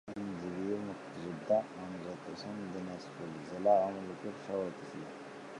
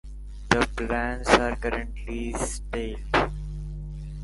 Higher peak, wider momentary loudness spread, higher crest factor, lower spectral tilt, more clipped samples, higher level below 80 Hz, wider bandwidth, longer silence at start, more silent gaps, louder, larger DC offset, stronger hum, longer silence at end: second, -16 dBFS vs -2 dBFS; about the same, 14 LU vs 16 LU; second, 20 dB vs 26 dB; first, -6.5 dB/octave vs -4.5 dB/octave; neither; second, -72 dBFS vs -34 dBFS; about the same, 11 kHz vs 11.5 kHz; about the same, 0.05 s vs 0.05 s; neither; second, -38 LUFS vs -27 LUFS; neither; second, none vs 50 Hz at -35 dBFS; about the same, 0 s vs 0 s